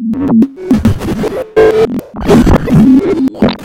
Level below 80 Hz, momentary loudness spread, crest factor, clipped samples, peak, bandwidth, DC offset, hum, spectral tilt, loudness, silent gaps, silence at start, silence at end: -22 dBFS; 8 LU; 10 dB; 0.3%; 0 dBFS; 16.5 kHz; under 0.1%; none; -7.5 dB/octave; -10 LUFS; none; 0 s; 0 s